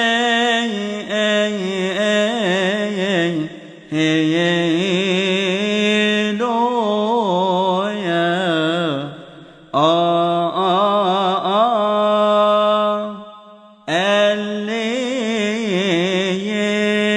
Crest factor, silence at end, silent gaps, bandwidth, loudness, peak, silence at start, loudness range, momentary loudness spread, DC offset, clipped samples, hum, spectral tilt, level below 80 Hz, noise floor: 16 dB; 0 s; none; 11 kHz; -17 LUFS; -2 dBFS; 0 s; 3 LU; 7 LU; under 0.1%; under 0.1%; none; -5 dB/octave; -64 dBFS; -43 dBFS